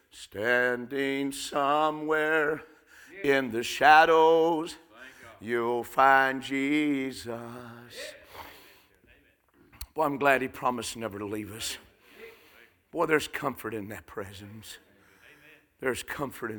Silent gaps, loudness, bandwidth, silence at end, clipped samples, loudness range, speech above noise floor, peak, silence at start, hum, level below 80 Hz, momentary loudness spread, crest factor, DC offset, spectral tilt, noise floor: none; -26 LUFS; 19.5 kHz; 0 s; under 0.1%; 10 LU; 36 dB; -6 dBFS; 0.15 s; none; -64 dBFS; 24 LU; 24 dB; under 0.1%; -4 dB/octave; -63 dBFS